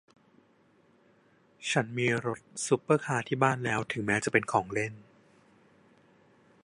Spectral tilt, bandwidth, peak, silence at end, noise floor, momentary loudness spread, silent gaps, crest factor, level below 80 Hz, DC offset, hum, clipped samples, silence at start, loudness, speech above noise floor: -5 dB/octave; 11.5 kHz; -8 dBFS; 1.65 s; -65 dBFS; 8 LU; none; 24 dB; -68 dBFS; under 0.1%; none; under 0.1%; 1.6 s; -29 LUFS; 36 dB